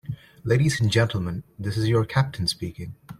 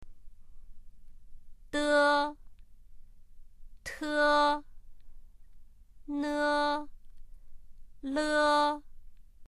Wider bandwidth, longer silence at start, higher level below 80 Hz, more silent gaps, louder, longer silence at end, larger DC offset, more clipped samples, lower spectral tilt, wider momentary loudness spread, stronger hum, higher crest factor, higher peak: about the same, 13.5 kHz vs 13 kHz; about the same, 0.05 s vs 0 s; about the same, -50 dBFS vs -50 dBFS; neither; first, -24 LUFS vs -29 LUFS; about the same, 0.05 s vs 0.05 s; neither; neither; first, -5.5 dB/octave vs -3 dB/octave; second, 13 LU vs 18 LU; neither; about the same, 16 dB vs 18 dB; first, -8 dBFS vs -14 dBFS